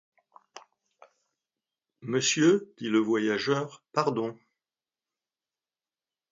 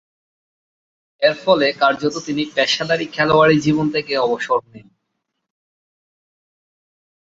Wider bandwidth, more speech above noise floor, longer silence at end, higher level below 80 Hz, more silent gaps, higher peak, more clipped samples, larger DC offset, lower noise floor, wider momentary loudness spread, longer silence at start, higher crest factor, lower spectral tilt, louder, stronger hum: about the same, 8 kHz vs 8 kHz; first, over 63 dB vs 58 dB; second, 2 s vs 2.45 s; second, -76 dBFS vs -56 dBFS; neither; second, -10 dBFS vs -2 dBFS; neither; neither; first, under -90 dBFS vs -75 dBFS; about the same, 10 LU vs 8 LU; second, 0.55 s vs 1.2 s; about the same, 22 dB vs 18 dB; about the same, -4 dB/octave vs -5 dB/octave; second, -27 LUFS vs -17 LUFS; neither